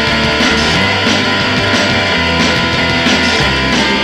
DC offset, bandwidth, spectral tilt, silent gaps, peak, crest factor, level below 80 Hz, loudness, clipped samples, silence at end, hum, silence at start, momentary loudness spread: under 0.1%; 15.5 kHz; -3.5 dB/octave; none; 0 dBFS; 12 dB; -30 dBFS; -11 LUFS; under 0.1%; 0 s; none; 0 s; 1 LU